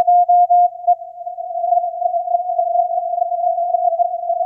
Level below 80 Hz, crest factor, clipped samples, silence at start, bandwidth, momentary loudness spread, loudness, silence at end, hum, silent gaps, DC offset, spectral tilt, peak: -78 dBFS; 10 dB; under 0.1%; 0 s; 0.9 kHz; 9 LU; -17 LUFS; 0 s; 50 Hz at -75 dBFS; none; under 0.1%; -6.5 dB/octave; -6 dBFS